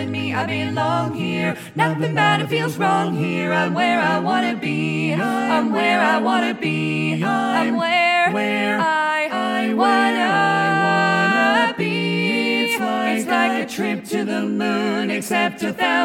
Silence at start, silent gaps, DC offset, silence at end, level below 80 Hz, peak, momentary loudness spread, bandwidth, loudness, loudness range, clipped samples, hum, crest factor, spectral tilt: 0 s; none; under 0.1%; 0 s; -68 dBFS; -4 dBFS; 6 LU; 17 kHz; -19 LUFS; 3 LU; under 0.1%; none; 16 dB; -5 dB/octave